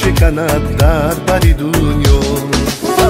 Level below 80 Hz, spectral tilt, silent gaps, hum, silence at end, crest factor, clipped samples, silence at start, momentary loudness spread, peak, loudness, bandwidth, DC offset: -16 dBFS; -5.5 dB/octave; none; none; 0 s; 12 dB; under 0.1%; 0 s; 3 LU; 0 dBFS; -13 LUFS; 16.5 kHz; under 0.1%